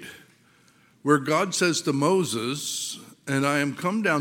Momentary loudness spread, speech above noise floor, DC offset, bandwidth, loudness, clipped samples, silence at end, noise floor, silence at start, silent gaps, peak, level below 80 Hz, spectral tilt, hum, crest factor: 10 LU; 35 dB; under 0.1%; 17.5 kHz; -24 LUFS; under 0.1%; 0 s; -59 dBFS; 0 s; none; -6 dBFS; -74 dBFS; -4 dB/octave; none; 18 dB